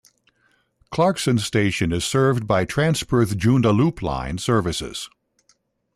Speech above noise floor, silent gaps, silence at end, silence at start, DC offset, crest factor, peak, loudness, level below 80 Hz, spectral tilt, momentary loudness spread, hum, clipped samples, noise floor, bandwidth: 44 dB; none; 0.9 s; 0.9 s; under 0.1%; 14 dB; -8 dBFS; -21 LUFS; -44 dBFS; -5.5 dB/octave; 9 LU; none; under 0.1%; -64 dBFS; 14 kHz